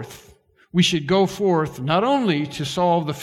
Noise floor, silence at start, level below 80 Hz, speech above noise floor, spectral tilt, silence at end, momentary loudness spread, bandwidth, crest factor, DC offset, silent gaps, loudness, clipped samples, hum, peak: -53 dBFS; 0 s; -54 dBFS; 33 dB; -5.5 dB/octave; 0 s; 6 LU; 14.5 kHz; 16 dB; under 0.1%; none; -20 LUFS; under 0.1%; none; -4 dBFS